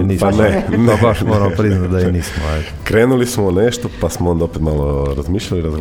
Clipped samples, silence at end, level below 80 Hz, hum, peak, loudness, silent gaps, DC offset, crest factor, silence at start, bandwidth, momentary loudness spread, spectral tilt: under 0.1%; 0 s; -26 dBFS; none; 0 dBFS; -15 LUFS; none; under 0.1%; 14 dB; 0 s; 16.5 kHz; 7 LU; -6.5 dB/octave